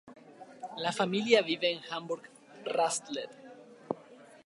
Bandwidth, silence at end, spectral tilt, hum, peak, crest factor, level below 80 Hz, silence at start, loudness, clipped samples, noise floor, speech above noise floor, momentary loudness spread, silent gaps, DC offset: 11.5 kHz; 0.1 s; -3 dB/octave; none; -8 dBFS; 24 dB; -84 dBFS; 0.05 s; -32 LUFS; under 0.1%; -55 dBFS; 24 dB; 23 LU; none; under 0.1%